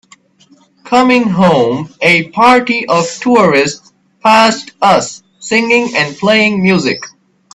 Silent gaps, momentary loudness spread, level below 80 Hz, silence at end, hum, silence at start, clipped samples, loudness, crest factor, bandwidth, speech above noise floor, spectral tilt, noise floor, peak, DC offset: none; 8 LU; -52 dBFS; 0.45 s; none; 0.85 s; under 0.1%; -10 LUFS; 12 dB; 12.5 kHz; 38 dB; -4.5 dB/octave; -48 dBFS; 0 dBFS; under 0.1%